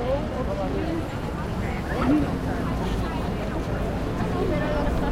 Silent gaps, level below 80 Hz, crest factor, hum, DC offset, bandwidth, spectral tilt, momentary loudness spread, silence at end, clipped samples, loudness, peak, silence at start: none; -32 dBFS; 16 dB; none; under 0.1%; 16 kHz; -7.5 dB/octave; 6 LU; 0 s; under 0.1%; -27 LUFS; -10 dBFS; 0 s